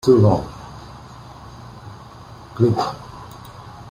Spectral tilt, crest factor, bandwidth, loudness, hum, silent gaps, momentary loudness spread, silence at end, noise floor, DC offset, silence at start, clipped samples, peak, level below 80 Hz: -8 dB/octave; 18 dB; 15 kHz; -18 LUFS; none; none; 23 LU; 0 s; -40 dBFS; under 0.1%; 0.05 s; under 0.1%; -2 dBFS; -46 dBFS